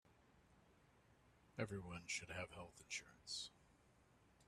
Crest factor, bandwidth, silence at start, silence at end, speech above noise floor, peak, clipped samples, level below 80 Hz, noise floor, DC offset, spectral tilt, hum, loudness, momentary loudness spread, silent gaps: 24 dB; 13 kHz; 0.05 s; 0 s; 22 dB; -30 dBFS; under 0.1%; -76 dBFS; -73 dBFS; under 0.1%; -3 dB/octave; none; -50 LUFS; 8 LU; none